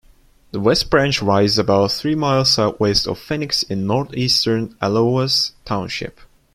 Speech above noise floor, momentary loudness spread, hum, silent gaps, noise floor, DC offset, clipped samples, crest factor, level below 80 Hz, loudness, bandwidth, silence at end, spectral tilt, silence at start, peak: 33 dB; 8 LU; none; none; -51 dBFS; under 0.1%; under 0.1%; 16 dB; -42 dBFS; -17 LUFS; 14.5 kHz; 0.45 s; -4.5 dB/octave; 0.55 s; -2 dBFS